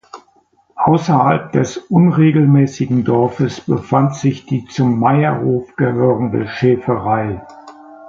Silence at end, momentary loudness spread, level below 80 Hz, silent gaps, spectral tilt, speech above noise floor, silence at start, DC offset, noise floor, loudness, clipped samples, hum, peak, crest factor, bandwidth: 0 s; 8 LU; -48 dBFS; none; -8 dB/octave; 41 dB; 0.15 s; under 0.1%; -55 dBFS; -15 LUFS; under 0.1%; none; 0 dBFS; 14 dB; 7.6 kHz